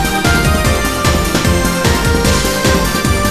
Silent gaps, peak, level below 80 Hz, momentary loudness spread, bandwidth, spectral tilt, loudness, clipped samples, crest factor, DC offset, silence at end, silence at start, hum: none; 0 dBFS; -20 dBFS; 2 LU; 14 kHz; -4 dB/octave; -13 LUFS; under 0.1%; 12 dB; under 0.1%; 0 s; 0 s; none